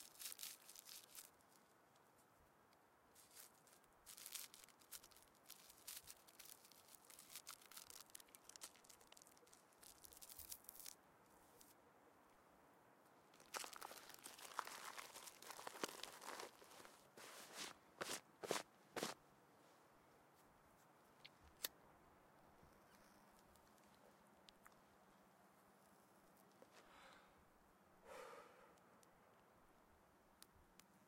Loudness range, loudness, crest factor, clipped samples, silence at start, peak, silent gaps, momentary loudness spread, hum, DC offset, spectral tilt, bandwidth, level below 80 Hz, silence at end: 13 LU; -56 LUFS; 38 dB; under 0.1%; 0 s; -22 dBFS; none; 17 LU; none; under 0.1%; -1 dB/octave; 16.5 kHz; -86 dBFS; 0 s